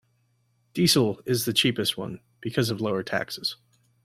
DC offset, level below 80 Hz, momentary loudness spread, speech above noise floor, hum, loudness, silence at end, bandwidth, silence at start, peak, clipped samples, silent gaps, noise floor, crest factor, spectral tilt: under 0.1%; -62 dBFS; 15 LU; 43 dB; none; -25 LUFS; 0.5 s; 16.5 kHz; 0.75 s; -8 dBFS; under 0.1%; none; -68 dBFS; 20 dB; -4 dB/octave